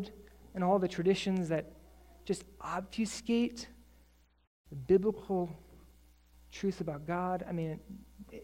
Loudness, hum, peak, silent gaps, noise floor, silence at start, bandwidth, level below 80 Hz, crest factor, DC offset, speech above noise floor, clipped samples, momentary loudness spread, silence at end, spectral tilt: -34 LUFS; none; -16 dBFS; 4.47-4.64 s; -65 dBFS; 0 s; 16 kHz; -60 dBFS; 20 dB; under 0.1%; 32 dB; under 0.1%; 20 LU; 0 s; -6 dB/octave